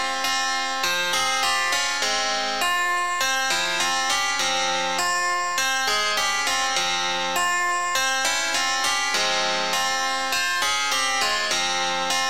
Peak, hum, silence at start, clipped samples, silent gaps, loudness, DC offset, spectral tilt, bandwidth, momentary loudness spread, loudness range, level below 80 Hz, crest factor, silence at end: -10 dBFS; none; 0 s; under 0.1%; none; -21 LUFS; 1%; 0.5 dB/octave; 17 kHz; 2 LU; 0 LU; -56 dBFS; 14 dB; 0 s